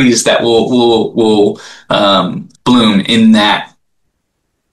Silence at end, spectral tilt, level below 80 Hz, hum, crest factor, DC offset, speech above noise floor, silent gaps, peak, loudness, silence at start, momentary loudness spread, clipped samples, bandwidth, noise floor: 1.05 s; -4.5 dB/octave; -48 dBFS; none; 10 dB; 0.3%; 57 dB; none; 0 dBFS; -10 LUFS; 0 s; 9 LU; under 0.1%; 12.5 kHz; -67 dBFS